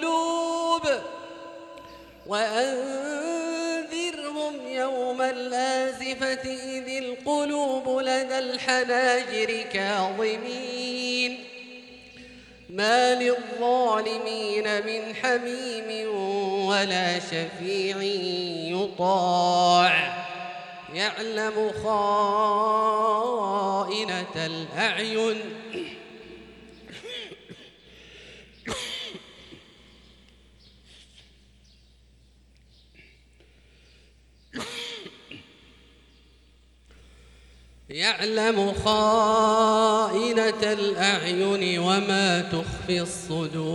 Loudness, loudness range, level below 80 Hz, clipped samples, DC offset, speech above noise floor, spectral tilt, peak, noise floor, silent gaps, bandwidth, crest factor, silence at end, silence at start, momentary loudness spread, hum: -25 LUFS; 18 LU; -58 dBFS; under 0.1%; under 0.1%; 33 dB; -3.5 dB/octave; -8 dBFS; -57 dBFS; none; 12.5 kHz; 20 dB; 0 s; 0 s; 20 LU; none